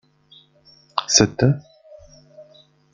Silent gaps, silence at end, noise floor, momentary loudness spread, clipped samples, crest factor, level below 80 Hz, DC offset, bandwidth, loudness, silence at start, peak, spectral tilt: none; 0.5 s; -54 dBFS; 13 LU; under 0.1%; 24 dB; -50 dBFS; under 0.1%; 11 kHz; -18 LUFS; 0.95 s; 0 dBFS; -3.5 dB/octave